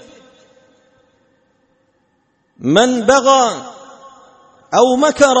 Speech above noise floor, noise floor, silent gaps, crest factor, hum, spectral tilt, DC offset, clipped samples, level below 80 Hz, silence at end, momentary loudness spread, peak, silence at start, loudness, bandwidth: 50 dB; -62 dBFS; none; 16 dB; none; -3.5 dB/octave; under 0.1%; under 0.1%; -54 dBFS; 0 s; 14 LU; 0 dBFS; 2.6 s; -13 LUFS; 8.8 kHz